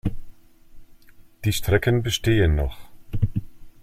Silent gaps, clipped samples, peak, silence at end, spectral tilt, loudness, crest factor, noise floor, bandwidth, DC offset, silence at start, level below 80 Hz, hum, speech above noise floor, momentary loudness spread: none; under 0.1%; -6 dBFS; 0.1 s; -5.5 dB/octave; -23 LUFS; 18 dB; -48 dBFS; 16 kHz; under 0.1%; 0.05 s; -34 dBFS; none; 27 dB; 12 LU